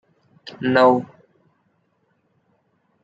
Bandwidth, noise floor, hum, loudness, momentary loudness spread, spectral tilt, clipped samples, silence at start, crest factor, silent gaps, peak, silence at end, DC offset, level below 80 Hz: 7.8 kHz; -67 dBFS; none; -18 LUFS; 26 LU; -7 dB/octave; under 0.1%; 0.5 s; 22 dB; none; -2 dBFS; 2 s; under 0.1%; -70 dBFS